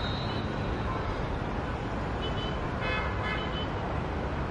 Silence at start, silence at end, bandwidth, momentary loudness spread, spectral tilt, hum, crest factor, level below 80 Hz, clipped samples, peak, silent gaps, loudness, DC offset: 0 s; 0 s; 10 kHz; 3 LU; -6.5 dB/octave; none; 14 dB; -38 dBFS; under 0.1%; -18 dBFS; none; -32 LUFS; under 0.1%